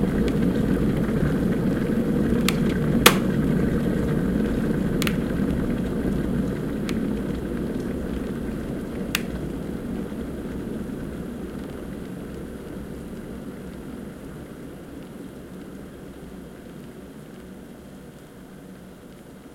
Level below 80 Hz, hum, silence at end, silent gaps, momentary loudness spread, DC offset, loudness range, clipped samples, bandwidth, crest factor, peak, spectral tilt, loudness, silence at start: -38 dBFS; none; 0 s; none; 19 LU; under 0.1%; 19 LU; under 0.1%; 16.5 kHz; 26 dB; 0 dBFS; -5.5 dB/octave; -25 LUFS; 0 s